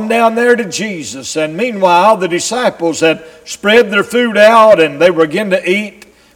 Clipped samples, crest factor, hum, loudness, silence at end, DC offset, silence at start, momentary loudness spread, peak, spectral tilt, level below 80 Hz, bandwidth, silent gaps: 0.2%; 12 dB; none; -11 LUFS; 0.45 s; under 0.1%; 0 s; 12 LU; 0 dBFS; -4 dB/octave; -54 dBFS; 17.5 kHz; none